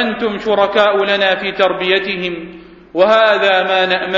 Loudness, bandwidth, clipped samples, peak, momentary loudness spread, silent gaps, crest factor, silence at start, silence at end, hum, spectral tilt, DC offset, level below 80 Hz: -13 LUFS; 7.6 kHz; under 0.1%; 0 dBFS; 11 LU; none; 14 dB; 0 s; 0 s; none; -5 dB/octave; under 0.1%; -52 dBFS